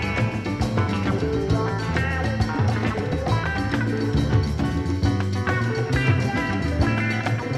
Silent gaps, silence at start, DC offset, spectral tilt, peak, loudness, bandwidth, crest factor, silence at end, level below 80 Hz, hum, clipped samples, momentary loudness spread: none; 0 s; under 0.1%; -7 dB/octave; -8 dBFS; -23 LUFS; 12 kHz; 14 dB; 0 s; -34 dBFS; none; under 0.1%; 3 LU